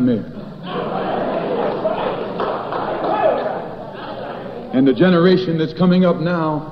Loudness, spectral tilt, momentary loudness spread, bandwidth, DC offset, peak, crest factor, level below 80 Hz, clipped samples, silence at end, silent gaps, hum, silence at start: -18 LUFS; -9.5 dB/octave; 15 LU; 5.8 kHz; under 0.1%; -2 dBFS; 16 dB; -48 dBFS; under 0.1%; 0 s; none; none; 0 s